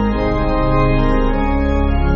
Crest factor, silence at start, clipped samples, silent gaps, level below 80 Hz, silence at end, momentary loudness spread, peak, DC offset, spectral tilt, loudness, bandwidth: 12 dB; 0 s; under 0.1%; none; -18 dBFS; 0 s; 2 LU; -2 dBFS; under 0.1%; -7 dB/octave; -17 LUFS; 6 kHz